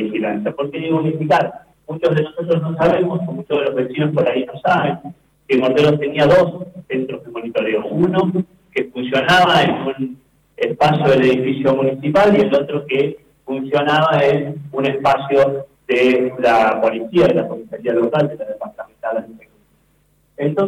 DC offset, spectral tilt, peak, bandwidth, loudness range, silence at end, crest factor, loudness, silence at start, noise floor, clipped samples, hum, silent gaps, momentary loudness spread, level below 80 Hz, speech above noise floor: under 0.1%; -7 dB/octave; -6 dBFS; 15 kHz; 3 LU; 0 s; 10 dB; -17 LUFS; 0 s; -58 dBFS; under 0.1%; none; none; 12 LU; -52 dBFS; 42 dB